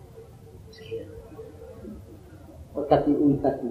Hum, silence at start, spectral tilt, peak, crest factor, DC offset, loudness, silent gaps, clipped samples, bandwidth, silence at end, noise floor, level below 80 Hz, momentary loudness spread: none; 0.1 s; -9 dB/octave; -6 dBFS; 22 dB; under 0.1%; -25 LUFS; none; under 0.1%; 6 kHz; 0 s; -46 dBFS; -50 dBFS; 25 LU